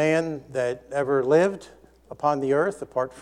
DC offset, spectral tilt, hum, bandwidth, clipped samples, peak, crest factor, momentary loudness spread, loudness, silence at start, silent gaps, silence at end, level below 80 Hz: under 0.1%; -6 dB/octave; none; 11.5 kHz; under 0.1%; -8 dBFS; 16 dB; 9 LU; -24 LUFS; 0 s; none; 0 s; -60 dBFS